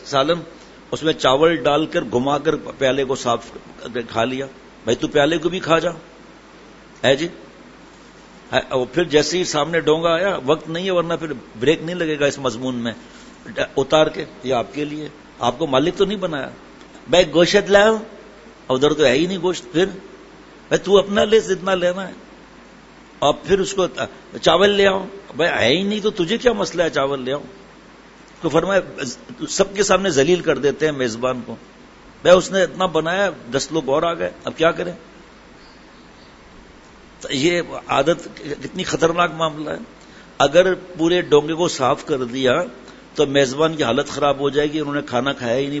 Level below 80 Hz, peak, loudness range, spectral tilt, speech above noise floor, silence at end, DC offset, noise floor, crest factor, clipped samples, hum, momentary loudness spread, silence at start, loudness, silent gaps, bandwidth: -48 dBFS; 0 dBFS; 5 LU; -4.5 dB/octave; 26 dB; 0 s; under 0.1%; -44 dBFS; 20 dB; under 0.1%; none; 14 LU; 0 s; -19 LUFS; none; 8 kHz